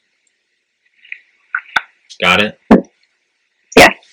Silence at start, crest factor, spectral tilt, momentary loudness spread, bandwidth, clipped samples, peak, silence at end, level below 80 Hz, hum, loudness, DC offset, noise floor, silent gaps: 1.55 s; 16 dB; -4 dB/octave; 26 LU; over 20 kHz; 0.8%; 0 dBFS; 0.2 s; -40 dBFS; none; -12 LUFS; under 0.1%; -67 dBFS; none